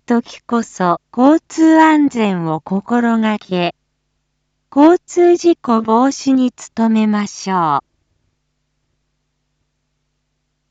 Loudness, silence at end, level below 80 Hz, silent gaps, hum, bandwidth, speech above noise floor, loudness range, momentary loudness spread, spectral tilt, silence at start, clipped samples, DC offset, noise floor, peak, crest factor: -14 LUFS; 2.9 s; -62 dBFS; none; none; 8 kHz; 56 dB; 7 LU; 9 LU; -6 dB/octave; 0.1 s; under 0.1%; under 0.1%; -69 dBFS; 0 dBFS; 16 dB